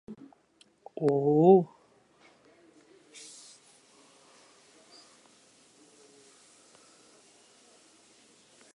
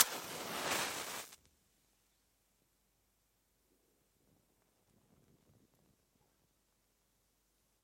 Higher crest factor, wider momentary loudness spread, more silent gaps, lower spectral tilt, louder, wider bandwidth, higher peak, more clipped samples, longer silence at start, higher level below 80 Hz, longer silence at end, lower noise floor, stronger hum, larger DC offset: second, 26 dB vs 36 dB; first, 30 LU vs 12 LU; neither; first, -8 dB/octave vs -0.5 dB/octave; first, -24 LUFS vs -38 LUFS; second, 11.5 kHz vs 16.5 kHz; about the same, -8 dBFS vs -10 dBFS; neither; about the same, 0.1 s vs 0 s; about the same, -82 dBFS vs -80 dBFS; first, 7.1 s vs 6.5 s; second, -65 dBFS vs -78 dBFS; neither; neither